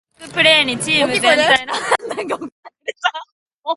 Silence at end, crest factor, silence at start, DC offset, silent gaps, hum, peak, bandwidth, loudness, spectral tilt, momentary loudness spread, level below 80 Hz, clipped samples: 0 s; 18 dB; 0.2 s; under 0.1%; 2.52-2.63 s, 3.32-3.46 s, 3.54-3.63 s; none; 0 dBFS; 11.5 kHz; -15 LUFS; -2 dB/octave; 19 LU; -58 dBFS; under 0.1%